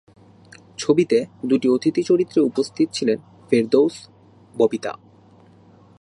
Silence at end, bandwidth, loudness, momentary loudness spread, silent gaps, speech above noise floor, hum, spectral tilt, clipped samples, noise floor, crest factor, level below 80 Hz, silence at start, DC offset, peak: 1.05 s; 11.5 kHz; -20 LUFS; 13 LU; none; 31 dB; none; -5.5 dB/octave; under 0.1%; -50 dBFS; 18 dB; -66 dBFS; 0.8 s; under 0.1%; -2 dBFS